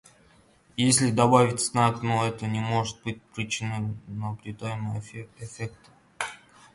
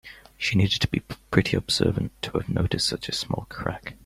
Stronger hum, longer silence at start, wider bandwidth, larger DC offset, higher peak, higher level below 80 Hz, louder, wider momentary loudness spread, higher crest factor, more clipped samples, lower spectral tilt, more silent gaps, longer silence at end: neither; first, 0.75 s vs 0.05 s; second, 11.5 kHz vs 15.5 kHz; neither; about the same, -4 dBFS vs -4 dBFS; second, -58 dBFS vs -44 dBFS; about the same, -26 LUFS vs -25 LUFS; first, 17 LU vs 9 LU; about the same, 22 dB vs 22 dB; neither; about the same, -4.5 dB/octave vs -5 dB/octave; neither; first, 0.4 s vs 0.1 s